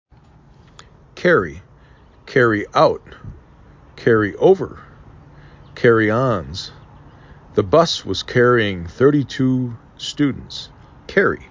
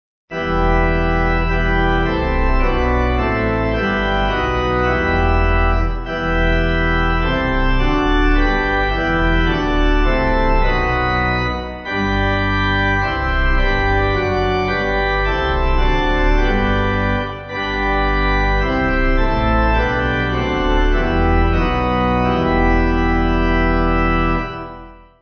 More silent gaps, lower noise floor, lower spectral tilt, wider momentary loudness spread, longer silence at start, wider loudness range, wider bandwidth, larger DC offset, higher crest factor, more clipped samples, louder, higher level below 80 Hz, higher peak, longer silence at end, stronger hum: neither; first, -48 dBFS vs -37 dBFS; about the same, -6 dB/octave vs -7 dB/octave; first, 15 LU vs 3 LU; first, 1.15 s vs 0.3 s; about the same, 2 LU vs 1 LU; first, 7.6 kHz vs 6.6 kHz; neither; first, 18 dB vs 12 dB; neither; about the same, -17 LUFS vs -17 LUFS; second, -44 dBFS vs -20 dBFS; about the same, -2 dBFS vs -2 dBFS; second, 0.05 s vs 0.3 s; neither